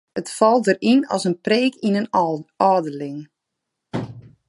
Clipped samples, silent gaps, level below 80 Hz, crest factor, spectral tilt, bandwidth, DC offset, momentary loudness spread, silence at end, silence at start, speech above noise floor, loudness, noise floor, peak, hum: under 0.1%; none; -64 dBFS; 18 dB; -5.5 dB/octave; 11.5 kHz; under 0.1%; 14 LU; 0.3 s; 0.15 s; 61 dB; -20 LUFS; -80 dBFS; -2 dBFS; none